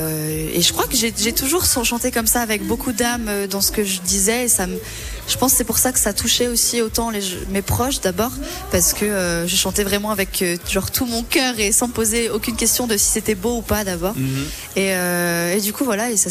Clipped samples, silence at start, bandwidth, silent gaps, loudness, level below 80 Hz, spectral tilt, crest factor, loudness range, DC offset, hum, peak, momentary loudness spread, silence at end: under 0.1%; 0 s; 15.5 kHz; none; -18 LUFS; -36 dBFS; -2.5 dB/octave; 14 dB; 2 LU; under 0.1%; none; -6 dBFS; 7 LU; 0 s